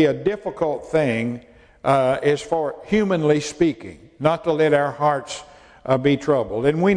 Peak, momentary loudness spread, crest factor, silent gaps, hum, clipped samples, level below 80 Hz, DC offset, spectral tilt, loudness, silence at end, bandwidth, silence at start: -2 dBFS; 10 LU; 18 dB; none; none; under 0.1%; -52 dBFS; under 0.1%; -6 dB/octave; -21 LUFS; 0 s; 10.5 kHz; 0 s